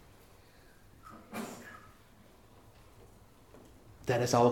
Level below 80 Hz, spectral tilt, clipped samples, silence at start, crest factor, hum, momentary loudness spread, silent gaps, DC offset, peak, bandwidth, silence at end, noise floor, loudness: -64 dBFS; -5.5 dB/octave; under 0.1%; 1.05 s; 24 dB; none; 28 LU; none; under 0.1%; -12 dBFS; 18 kHz; 0 s; -60 dBFS; -34 LUFS